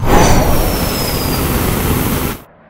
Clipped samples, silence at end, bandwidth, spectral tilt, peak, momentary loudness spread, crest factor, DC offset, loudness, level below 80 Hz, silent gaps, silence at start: 0.1%; 0.3 s; 16.5 kHz; -4.5 dB/octave; 0 dBFS; 6 LU; 12 dB; under 0.1%; -14 LUFS; -20 dBFS; none; 0 s